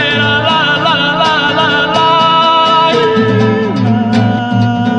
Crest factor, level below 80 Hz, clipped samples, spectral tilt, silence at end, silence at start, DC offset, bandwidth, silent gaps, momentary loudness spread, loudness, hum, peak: 10 dB; -44 dBFS; under 0.1%; -6 dB/octave; 0 s; 0 s; under 0.1%; 9.6 kHz; none; 4 LU; -10 LUFS; none; 0 dBFS